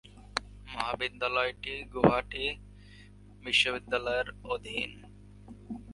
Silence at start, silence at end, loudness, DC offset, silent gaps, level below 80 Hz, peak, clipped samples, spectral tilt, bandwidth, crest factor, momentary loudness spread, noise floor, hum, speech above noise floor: 0.05 s; 0 s; -31 LUFS; under 0.1%; none; -52 dBFS; -6 dBFS; under 0.1%; -4 dB/octave; 11.5 kHz; 28 dB; 19 LU; -53 dBFS; 50 Hz at -50 dBFS; 22 dB